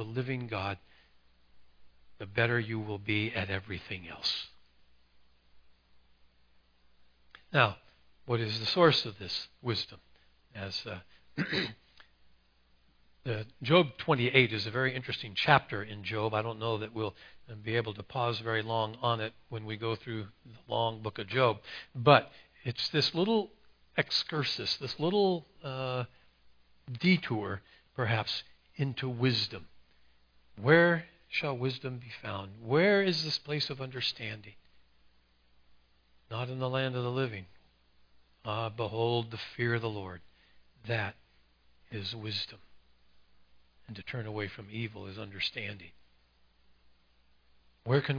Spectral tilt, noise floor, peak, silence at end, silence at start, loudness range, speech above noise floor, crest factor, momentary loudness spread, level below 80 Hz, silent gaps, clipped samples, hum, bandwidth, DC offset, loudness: -6 dB/octave; -66 dBFS; -6 dBFS; 0 s; 0 s; 11 LU; 35 dB; 28 dB; 17 LU; -68 dBFS; none; under 0.1%; none; 5.4 kHz; under 0.1%; -32 LUFS